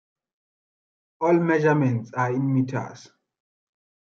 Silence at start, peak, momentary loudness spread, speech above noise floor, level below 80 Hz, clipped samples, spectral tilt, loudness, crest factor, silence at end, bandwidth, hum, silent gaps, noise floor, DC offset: 1.2 s; -8 dBFS; 9 LU; over 68 dB; -72 dBFS; under 0.1%; -8.5 dB/octave; -23 LUFS; 18 dB; 1.05 s; 7.2 kHz; none; none; under -90 dBFS; under 0.1%